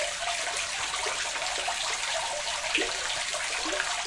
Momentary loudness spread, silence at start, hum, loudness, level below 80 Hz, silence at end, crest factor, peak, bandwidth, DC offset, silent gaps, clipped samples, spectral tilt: 2 LU; 0 s; none; -28 LUFS; -56 dBFS; 0 s; 20 dB; -10 dBFS; 12 kHz; under 0.1%; none; under 0.1%; 0.5 dB/octave